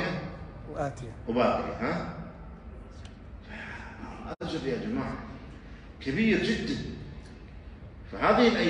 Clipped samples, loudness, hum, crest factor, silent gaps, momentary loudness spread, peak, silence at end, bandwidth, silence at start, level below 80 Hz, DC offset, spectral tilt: under 0.1%; -30 LUFS; none; 22 dB; none; 22 LU; -10 dBFS; 0 s; 10 kHz; 0 s; -48 dBFS; under 0.1%; -6 dB/octave